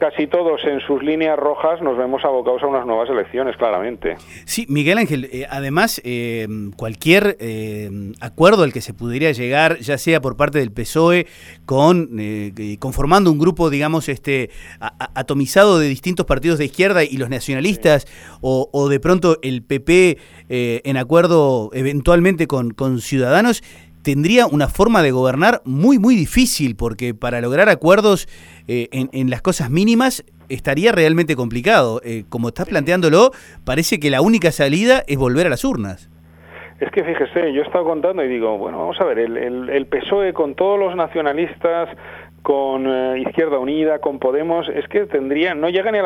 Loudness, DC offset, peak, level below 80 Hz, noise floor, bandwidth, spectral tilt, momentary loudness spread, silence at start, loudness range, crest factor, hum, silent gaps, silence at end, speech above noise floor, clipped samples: -17 LUFS; under 0.1%; 0 dBFS; -38 dBFS; -40 dBFS; 19 kHz; -5.5 dB/octave; 12 LU; 0 s; 5 LU; 16 dB; none; none; 0 s; 24 dB; under 0.1%